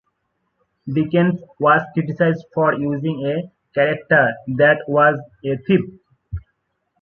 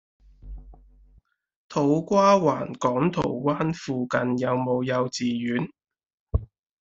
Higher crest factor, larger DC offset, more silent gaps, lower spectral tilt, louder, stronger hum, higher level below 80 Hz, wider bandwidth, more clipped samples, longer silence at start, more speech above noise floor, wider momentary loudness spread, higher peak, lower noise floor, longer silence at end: about the same, 18 dB vs 20 dB; neither; second, none vs 1.56-1.69 s, 6.14-6.27 s; first, -9.5 dB/octave vs -6.5 dB/octave; first, -18 LUFS vs -24 LUFS; neither; second, -48 dBFS vs -42 dBFS; second, 4.4 kHz vs 8 kHz; neither; first, 0.85 s vs 0.45 s; first, 54 dB vs 37 dB; about the same, 13 LU vs 12 LU; first, -2 dBFS vs -6 dBFS; first, -72 dBFS vs -60 dBFS; first, 0.65 s vs 0.35 s